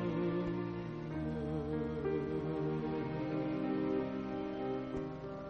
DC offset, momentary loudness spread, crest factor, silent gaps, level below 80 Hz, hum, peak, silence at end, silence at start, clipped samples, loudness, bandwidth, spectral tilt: under 0.1%; 5 LU; 12 dB; none; -56 dBFS; none; -24 dBFS; 0 s; 0 s; under 0.1%; -38 LUFS; 6.4 kHz; -9 dB/octave